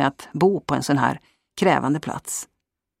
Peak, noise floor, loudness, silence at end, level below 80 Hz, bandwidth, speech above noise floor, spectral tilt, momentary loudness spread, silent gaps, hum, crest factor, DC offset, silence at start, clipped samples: -4 dBFS; -79 dBFS; -22 LUFS; 0.55 s; -58 dBFS; 16 kHz; 58 dB; -5 dB/octave; 14 LU; none; none; 18 dB; under 0.1%; 0 s; under 0.1%